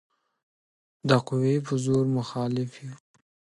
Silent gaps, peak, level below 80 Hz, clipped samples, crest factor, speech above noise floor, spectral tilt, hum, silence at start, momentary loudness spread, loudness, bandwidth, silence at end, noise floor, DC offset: none; -6 dBFS; -64 dBFS; under 0.1%; 20 dB; over 65 dB; -7 dB/octave; none; 1.05 s; 12 LU; -26 LUFS; 11.5 kHz; 0.5 s; under -90 dBFS; under 0.1%